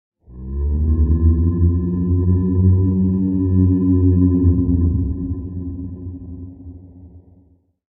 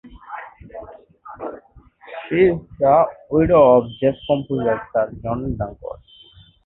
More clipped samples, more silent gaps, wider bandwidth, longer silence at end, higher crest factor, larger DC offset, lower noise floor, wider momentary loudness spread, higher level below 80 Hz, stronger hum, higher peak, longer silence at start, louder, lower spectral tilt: neither; neither; second, 1.8 kHz vs 4.1 kHz; about the same, 0.7 s vs 0.75 s; about the same, 14 dB vs 18 dB; neither; first, -54 dBFS vs -48 dBFS; second, 18 LU vs 23 LU; first, -24 dBFS vs -44 dBFS; neither; about the same, -4 dBFS vs -2 dBFS; first, 0.3 s vs 0.05 s; about the same, -17 LUFS vs -18 LUFS; first, -16 dB/octave vs -12 dB/octave